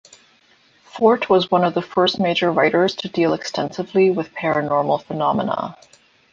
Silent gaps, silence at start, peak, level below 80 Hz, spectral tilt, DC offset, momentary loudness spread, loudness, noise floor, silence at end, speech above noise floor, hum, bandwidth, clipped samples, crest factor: none; 0.95 s; -2 dBFS; -60 dBFS; -6 dB/octave; under 0.1%; 8 LU; -19 LUFS; -56 dBFS; 0.55 s; 37 dB; none; 7.6 kHz; under 0.1%; 18 dB